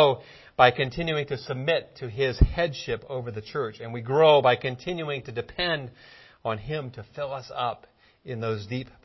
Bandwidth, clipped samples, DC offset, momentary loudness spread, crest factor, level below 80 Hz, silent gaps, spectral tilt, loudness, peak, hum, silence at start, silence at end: 6.2 kHz; under 0.1%; under 0.1%; 15 LU; 24 dB; -38 dBFS; none; -6.5 dB/octave; -26 LUFS; -2 dBFS; none; 0 s; 0.2 s